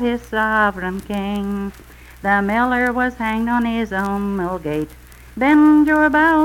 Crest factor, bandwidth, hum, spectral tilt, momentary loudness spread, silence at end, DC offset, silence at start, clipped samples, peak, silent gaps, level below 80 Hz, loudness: 14 dB; 15.5 kHz; none; -6.5 dB/octave; 13 LU; 0 s; under 0.1%; 0 s; under 0.1%; -4 dBFS; none; -40 dBFS; -18 LUFS